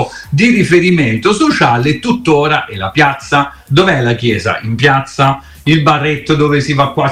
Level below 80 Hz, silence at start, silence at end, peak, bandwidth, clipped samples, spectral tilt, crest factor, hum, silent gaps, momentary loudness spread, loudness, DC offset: -40 dBFS; 0 s; 0 s; 0 dBFS; 13.5 kHz; under 0.1%; -6 dB/octave; 12 dB; none; none; 5 LU; -11 LUFS; under 0.1%